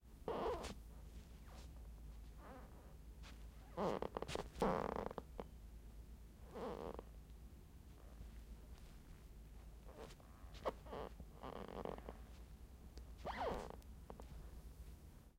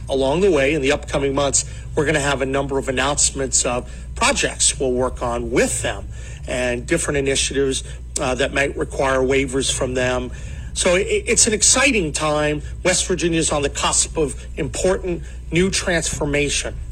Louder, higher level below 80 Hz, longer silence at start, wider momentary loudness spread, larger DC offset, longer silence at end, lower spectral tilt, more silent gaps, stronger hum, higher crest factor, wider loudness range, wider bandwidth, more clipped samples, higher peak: second, -51 LUFS vs -19 LUFS; second, -58 dBFS vs -32 dBFS; about the same, 0 s vs 0 s; first, 17 LU vs 9 LU; neither; about the same, 0 s vs 0 s; first, -6 dB/octave vs -3 dB/octave; neither; neither; first, 24 dB vs 18 dB; first, 10 LU vs 4 LU; about the same, 16 kHz vs 16 kHz; neither; second, -26 dBFS vs -2 dBFS